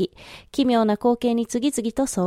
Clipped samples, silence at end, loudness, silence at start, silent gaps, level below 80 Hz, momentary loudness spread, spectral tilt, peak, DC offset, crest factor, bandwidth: under 0.1%; 0 s; -22 LUFS; 0 s; none; -52 dBFS; 10 LU; -5 dB/octave; -6 dBFS; under 0.1%; 16 dB; 15.5 kHz